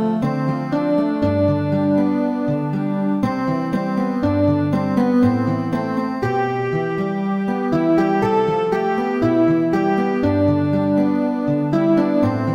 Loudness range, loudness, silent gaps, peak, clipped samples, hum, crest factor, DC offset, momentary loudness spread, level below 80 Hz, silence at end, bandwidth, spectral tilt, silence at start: 2 LU; -19 LUFS; none; -6 dBFS; under 0.1%; none; 12 dB; under 0.1%; 5 LU; -50 dBFS; 0 s; 10.5 kHz; -9 dB/octave; 0 s